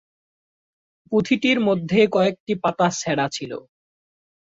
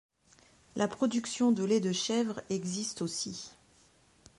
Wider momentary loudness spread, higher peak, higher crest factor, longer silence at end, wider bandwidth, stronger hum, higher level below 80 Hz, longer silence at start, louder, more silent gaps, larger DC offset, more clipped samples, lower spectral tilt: about the same, 9 LU vs 10 LU; first, -4 dBFS vs -16 dBFS; about the same, 18 dB vs 16 dB; first, 1 s vs 0.85 s; second, 8 kHz vs 11.5 kHz; neither; first, -62 dBFS vs -72 dBFS; first, 1.1 s vs 0.75 s; first, -21 LUFS vs -32 LUFS; first, 2.40-2.46 s vs none; neither; neither; about the same, -5 dB/octave vs -4.5 dB/octave